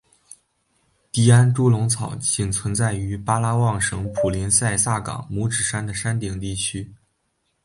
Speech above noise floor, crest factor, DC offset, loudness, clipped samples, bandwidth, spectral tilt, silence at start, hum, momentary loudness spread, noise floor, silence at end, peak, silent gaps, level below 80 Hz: 50 dB; 20 dB; under 0.1%; -21 LUFS; under 0.1%; 11.5 kHz; -4.5 dB/octave; 1.15 s; none; 11 LU; -71 dBFS; 0.7 s; -2 dBFS; none; -44 dBFS